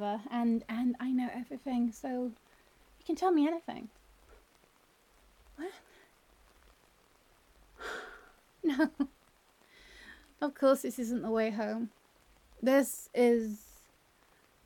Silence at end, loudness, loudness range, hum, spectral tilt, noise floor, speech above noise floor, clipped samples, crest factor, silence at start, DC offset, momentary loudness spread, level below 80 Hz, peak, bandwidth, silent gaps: 1.05 s; -33 LUFS; 19 LU; none; -5 dB/octave; -67 dBFS; 35 dB; under 0.1%; 18 dB; 0 s; under 0.1%; 18 LU; -68 dBFS; -16 dBFS; 17.5 kHz; none